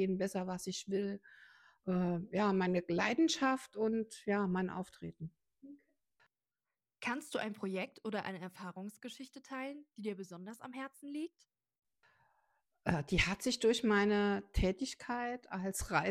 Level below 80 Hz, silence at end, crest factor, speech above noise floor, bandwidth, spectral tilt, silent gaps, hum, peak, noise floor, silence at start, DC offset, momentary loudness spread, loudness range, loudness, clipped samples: -54 dBFS; 0 s; 24 dB; over 53 dB; 15 kHz; -5 dB/octave; none; none; -14 dBFS; under -90 dBFS; 0 s; under 0.1%; 16 LU; 12 LU; -37 LUFS; under 0.1%